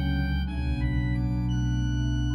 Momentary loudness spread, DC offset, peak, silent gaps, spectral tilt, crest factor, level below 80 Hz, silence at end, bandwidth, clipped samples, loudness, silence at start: 2 LU; under 0.1%; -16 dBFS; none; -7 dB/octave; 10 dB; -30 dBFS; 0 s; 6.2 kHz; under 0.1%; -28 LUFS; 0 s